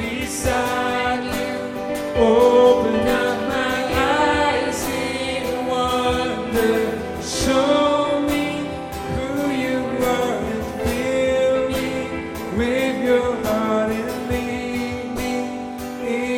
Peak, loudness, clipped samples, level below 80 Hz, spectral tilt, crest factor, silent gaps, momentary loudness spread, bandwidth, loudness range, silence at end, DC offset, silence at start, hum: -2 dBFS; -20 LUFS; under 0.1%; -38 dBFS; -4.5 dB/octave; 18 dB; none; 9 LU; 16.5 kHz; 4 LU; 0 s; under 0.1%; 0 s; none